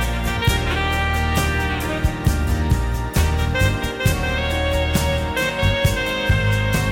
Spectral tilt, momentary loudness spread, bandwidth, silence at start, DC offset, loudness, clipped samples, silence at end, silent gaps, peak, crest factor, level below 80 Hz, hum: -5 dB/octave; 3 LU; 17 kHz; 0 s; under 0.1%; -20 LUFS; under 0.1%; 0 s; none; -6 dBFS; 14 dB; -24 dBFS; none